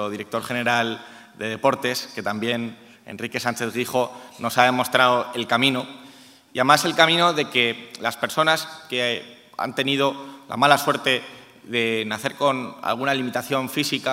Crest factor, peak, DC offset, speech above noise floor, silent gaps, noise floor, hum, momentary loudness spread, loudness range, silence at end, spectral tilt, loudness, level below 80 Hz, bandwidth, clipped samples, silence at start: 22 dB; 0 dBFS; under 0.1%; 25 dB; none; -47 dBFS; none; 13 LU; 6 LU; 0 s; -3.5 dB/octave; -22 LUFS; -72 dBFS; 16 kHz; under 0.1%; 0 s